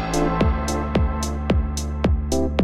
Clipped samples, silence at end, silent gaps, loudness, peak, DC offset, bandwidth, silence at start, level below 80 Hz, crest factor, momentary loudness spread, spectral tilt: under 0.1%; 0 s; none; -22 LUFS; -6 dBFS; under 0.1%; 13.5 kHz; 0 s; -26 dBFS; 14 dB; 3 LU; -6 dB/octave